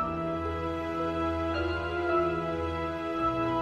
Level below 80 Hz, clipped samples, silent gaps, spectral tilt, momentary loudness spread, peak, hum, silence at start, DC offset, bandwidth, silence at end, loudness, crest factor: -46 dBFS; under 0.1%; none; -7.5 dB/octave; 5 LU; -16 dBFS; none; 0 s; under 0.1%; 9 kHz; 0 s; -30 LUFS; 14 dB